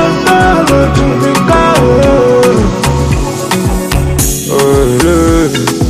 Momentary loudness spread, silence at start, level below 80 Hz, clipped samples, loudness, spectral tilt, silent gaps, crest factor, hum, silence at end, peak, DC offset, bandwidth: 5 LU; 0 s; -18 dBFS; 0.2%; -9 LUFS; -5 dB/octave; none; 8 dB; none; 0 s; 0 dBFS; under 0.1%; 16 kHz